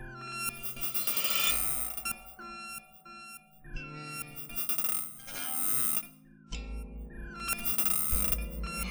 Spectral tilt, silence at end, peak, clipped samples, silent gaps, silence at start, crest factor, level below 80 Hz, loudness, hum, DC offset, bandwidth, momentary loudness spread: -1.5 dB/octave; 0 s; -12 dBFS; under 0.1%; none; 0 s; 22 dB; -44 dBFS; -30 LUFS; none; under 0.1%; over 20 kHz; 20 LU